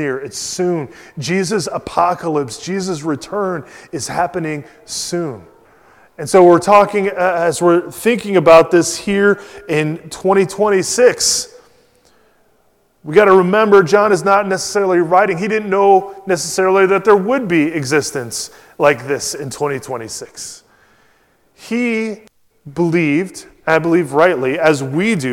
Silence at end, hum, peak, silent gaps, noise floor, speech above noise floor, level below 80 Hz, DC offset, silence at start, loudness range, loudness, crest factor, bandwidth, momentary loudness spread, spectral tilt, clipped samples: 0 s; none; 0 dBFS; none; -57 dBFS; 43 dB; -54 dBFS; under 0.1%; 0 s; 9 LU; -14 LUFS; 16 dB; 16.5 kHz; 15 LU; -4.5 dB/octave; 0.3%